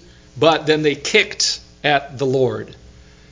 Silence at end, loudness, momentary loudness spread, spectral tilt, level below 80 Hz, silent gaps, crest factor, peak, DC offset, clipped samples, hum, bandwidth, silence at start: 0.55 s; -17 LUFS; 7 LU; -3.5 dB/octave; -50 dBFS; none; 20 dB; 0 dBFS; under 0.1%; under 0.1%; none; 7.8 kHz; 0.35 s